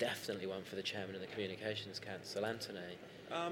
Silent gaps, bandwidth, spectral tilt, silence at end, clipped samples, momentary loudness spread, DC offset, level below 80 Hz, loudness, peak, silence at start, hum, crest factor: none; 17 kHz; -4 dB/octave; 0 s; under 0.1%; 5 LU; under 0.1%; -78 dBFS; -43 LUFS; -24 dBFS; 0 s; none; 18 dB